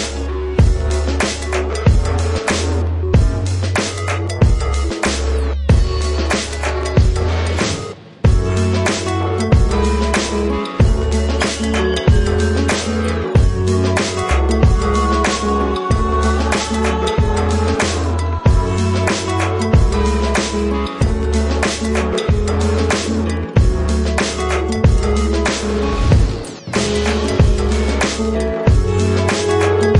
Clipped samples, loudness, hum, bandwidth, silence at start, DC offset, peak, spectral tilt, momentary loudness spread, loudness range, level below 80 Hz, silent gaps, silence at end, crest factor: under 0.1%; -17 LUFS; none; 11.5 kHz; 0 s; under 0.1%; -2 dBFS; -5.5 dB/octave; 4 LU; 2 LU; -20 dBFS; none; 0 s; 14 dB